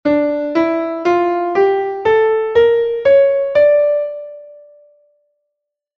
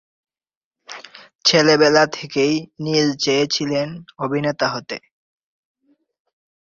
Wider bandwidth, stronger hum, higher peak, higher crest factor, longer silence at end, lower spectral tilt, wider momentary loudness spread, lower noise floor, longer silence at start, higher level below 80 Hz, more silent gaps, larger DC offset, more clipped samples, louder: second, 6.2 kHz vs 7.6 kHz; neither; about the same, -2 dBFS vs -2 dBFS; second, 14 dB vs 20 dB; second, 1.45 s vs 1.7 s; first, -6.5 dB/octave vs -4 dB/octave; second, 6 LU vs 19 LU; first, -77 dBFS vs -39 dBFS; second, 0.05 s vs 0.9 s; first, -54 dBFS vs -62 dBFS; second, none vs 1.35-1.39 s; neither; neither; first, -14 LUFS vs -18 LUFS